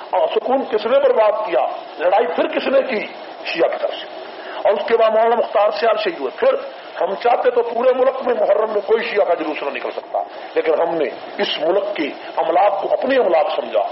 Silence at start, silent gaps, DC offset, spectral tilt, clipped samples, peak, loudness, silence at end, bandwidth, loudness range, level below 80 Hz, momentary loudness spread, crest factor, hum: 0 s; none; under 0.1%; -1 dB/octave; under 0.1%; -4 dBFS; -18 LUFS; 0 s; 6 kHz; 3 LU; -68 dBFS; 9 LU; 14 dB; none